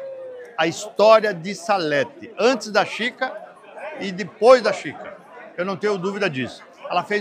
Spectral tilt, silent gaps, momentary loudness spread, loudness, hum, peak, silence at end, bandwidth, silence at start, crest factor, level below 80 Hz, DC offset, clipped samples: -4 dB/octave; none; 22 LU; -20 LUFS; none; -2 dBFS; 0 s; 12 kHz; 0 s; 20 dB; -70 dBFS; under 0.1%; under 0.1%